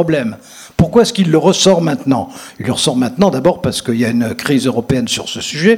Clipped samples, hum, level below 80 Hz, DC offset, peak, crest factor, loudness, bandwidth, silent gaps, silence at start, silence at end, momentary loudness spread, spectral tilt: 0.3%; none; -40 dBFS; under 0.1%; 0 dBFS; 14 dB; -14 LUFS; 16.5 kHz; none; 0 s; 0 s; 9 LU; -5 dB/octave